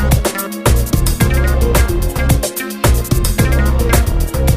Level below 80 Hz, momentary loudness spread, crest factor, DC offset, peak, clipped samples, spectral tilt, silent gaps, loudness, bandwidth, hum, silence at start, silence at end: -16 dBFS; 3 LU; 12 dB; under 0.1%; 0 dBFS; under 0.1%; -5 dB/octave; none; -15 LUFS; 16 kHz; none; 0 s; 0 s